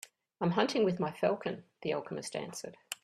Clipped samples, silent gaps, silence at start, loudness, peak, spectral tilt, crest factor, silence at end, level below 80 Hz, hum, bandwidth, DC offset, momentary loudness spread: under 0.1%; none; 0.4 s; -34 LUFS; -12 dBFS; -5 dB/octave; 22 dB; 0.1 s; -74 dBFS; none; 13.5 kHz; under 0.1%; 13 LU